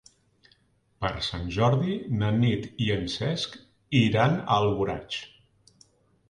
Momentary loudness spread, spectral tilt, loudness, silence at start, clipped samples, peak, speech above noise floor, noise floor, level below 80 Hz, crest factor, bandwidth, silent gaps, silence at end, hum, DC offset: 10 LU; -6.5 dB/octave; -26 LUFS; 1 s; under 0.1%; -8 dBFS; 40 dB; -65 dBFS; -50 dBFS; 20 dB; 10.5 kHz; none; 1.05 s; none; under 0.1%